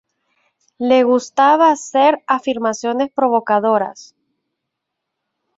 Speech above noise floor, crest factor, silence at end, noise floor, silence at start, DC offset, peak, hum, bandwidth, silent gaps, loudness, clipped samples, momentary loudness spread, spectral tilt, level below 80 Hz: 63 dB; 16 dB; 1.55 s; -78 dBFS; 0.8 s; under 0.1%; -2 dBFS; none; 8 kHz; none; -15 LUFS; under 0.1%; 7 LU; -4 dB/octave; -66 dBFS